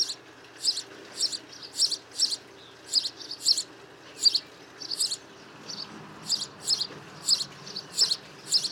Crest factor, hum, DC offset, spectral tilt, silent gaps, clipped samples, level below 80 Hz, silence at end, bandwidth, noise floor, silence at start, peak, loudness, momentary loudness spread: 22 dB; none; under 0.1%; 0.5 dB/octave; none; under 0.1%; -74 dBFS; 0 s; 17.5 kHz; -49 dBFS; 0 s; -10 dBFS; -27 LUFS; 16 LU